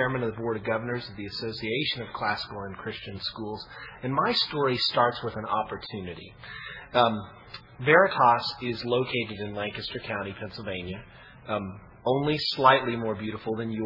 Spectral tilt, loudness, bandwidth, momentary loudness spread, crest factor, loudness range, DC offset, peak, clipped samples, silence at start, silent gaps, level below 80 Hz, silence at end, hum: -6.5 dB/octave; -27 LUFS; 5.8 kHz; 18 LU; 24 dB; 7 LU; under 0.1%; -4 dBFS; under 0.1%; 0 s; none; -58 dBFS; 0 s; none